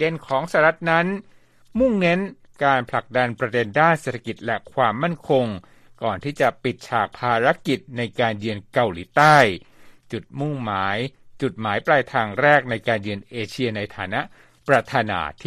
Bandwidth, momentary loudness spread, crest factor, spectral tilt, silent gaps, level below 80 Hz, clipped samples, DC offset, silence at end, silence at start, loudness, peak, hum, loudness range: 14 kHz; 12 LU; 20 dB; -6 dB/octave; none; -54 dBFS; under 0.1%; under 0.1%; 0.05 s; 0 s; -21 LUFS; -2 dBFS; none; 3 LU